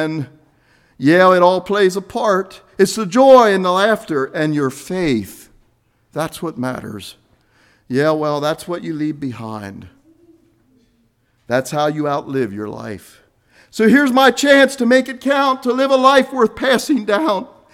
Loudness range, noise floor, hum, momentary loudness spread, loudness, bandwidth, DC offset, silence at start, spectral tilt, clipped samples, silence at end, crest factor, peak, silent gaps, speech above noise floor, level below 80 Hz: 11 LU; -60 dBFS; none; 18 LU; -15 LUFS; 16 kHz; under 0.1%; 0 s; -5 dB/octave; under 0.1%; 0.3 s; 16 dB; 0 dBFS; none; 45 dB; -54 dBFS